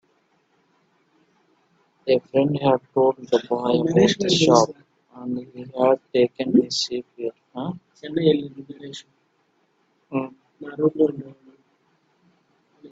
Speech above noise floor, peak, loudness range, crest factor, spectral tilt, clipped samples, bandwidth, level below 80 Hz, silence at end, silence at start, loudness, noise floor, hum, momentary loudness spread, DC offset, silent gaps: 45 dB; 0 dBFS; 9 LU; 22 dB; -5.5 dB/octave; under 0.1%; 8.4 kHz; -64 dBFS; 0.05 s; 2.05 s; -22 LUFS; -66 dBFS; none; 19 LU; under 0.1%; none